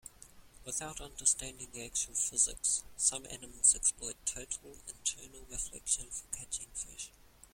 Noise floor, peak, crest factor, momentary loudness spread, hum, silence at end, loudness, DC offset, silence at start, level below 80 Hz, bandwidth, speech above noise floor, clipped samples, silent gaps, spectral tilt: -57 dBFS; -10 dBFS; 26 dB; 17 LU; none; 0.45 s; -33 LUFS; under 0.1%; 0.05 s; -56 dBFS; 16.5 kHz; 20 dB; under 0.1%; none; 0 dB/octave